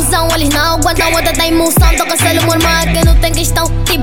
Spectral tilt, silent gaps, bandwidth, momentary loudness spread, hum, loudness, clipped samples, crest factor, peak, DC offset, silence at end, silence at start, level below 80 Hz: -4 dB/octave; none; 17.5 kHz; 3 LU; none; -11 LUFS; under 0.1%; 10 dB; 0 dBFS; 3%; 0 s; 0 s; -16 dBFS